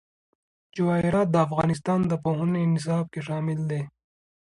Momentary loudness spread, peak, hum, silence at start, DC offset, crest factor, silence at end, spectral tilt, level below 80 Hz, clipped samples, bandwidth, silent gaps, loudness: 8 LU; -8 dBFS; none; 0.75 s; under 0.1%; 18 dB; 0.65 s; -8 dB/octave; -56 dBFS; under 0.1%; 11 kHz; none; -25 LUFS